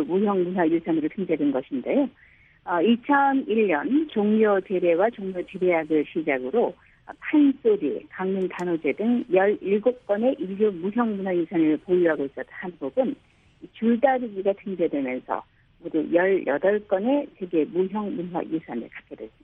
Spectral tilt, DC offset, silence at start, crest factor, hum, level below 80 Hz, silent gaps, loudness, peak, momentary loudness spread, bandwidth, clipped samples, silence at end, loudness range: -8.5 dB/octave; under 0.1%; 0 s; 18 dB; none; -64 dBFS; none; -24 LUFS; -6 dBFS; 10 LU; 7.6 kHz; under 0.1%; 0.15 s; 3 LU